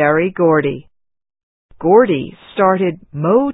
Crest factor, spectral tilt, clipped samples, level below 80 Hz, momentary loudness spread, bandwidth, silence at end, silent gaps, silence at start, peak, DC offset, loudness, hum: 16 dB; -12.5 dB/octave; under 0.1%; -52 dBFS; 11 LU; 4 kHz; 0 s; 1.43-1.69 s; 0 s; 0 dBFS; under 0.1%; -15 LUFS; none